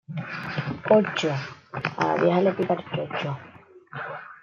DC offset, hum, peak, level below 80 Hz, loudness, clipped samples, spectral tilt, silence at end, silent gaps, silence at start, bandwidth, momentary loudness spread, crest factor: under 0.1%; none; -6 dBFS; -66 dBFS; -25 LUFS; under 0.1%; -6.5 dB/octave; 0.05 s; none; 0.1 s; 7.4 kHz; 15 LU; 20 dB